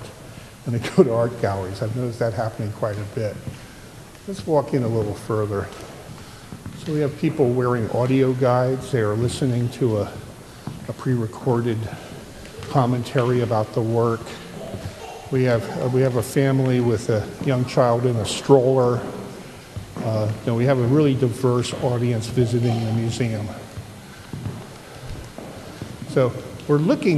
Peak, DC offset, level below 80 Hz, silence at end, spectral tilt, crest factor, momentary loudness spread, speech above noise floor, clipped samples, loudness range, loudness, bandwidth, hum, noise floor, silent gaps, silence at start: 0 dBFS; under 0.1%; -50 dBFS; 0 s; -7 dB/octave; 22 dB; 19 LU; 21 dB; under 0.1%; 6 LU; -22 LUFS; 13.5 kHz; none; -41 dBFS; none; 0 s